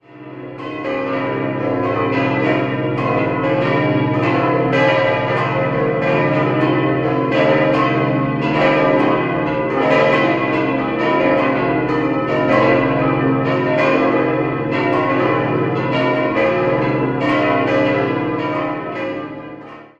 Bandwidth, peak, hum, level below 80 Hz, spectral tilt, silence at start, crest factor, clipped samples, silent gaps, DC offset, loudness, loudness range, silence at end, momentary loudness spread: 7.8 kHz; -2 dBFS; none; -46 dBFS; -8 dB/octave; 0.15 s; 16 dB; under 0.1%; none; under 0.1%; -16 LUFS; 2 LU; 0.15 s; 6 LU